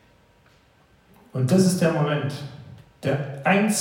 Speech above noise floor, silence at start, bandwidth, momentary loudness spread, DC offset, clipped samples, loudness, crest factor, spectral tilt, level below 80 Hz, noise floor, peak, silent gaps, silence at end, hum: 37 dB; 1.35 s; 16.5 kHz; 17 LU; under 0.1%; under 0.1%; -22 LUFS; 18 dB; -5.5 dB/octave; -62 dBFS; -58 dBFS; -6 dBFS; none; 0 s; none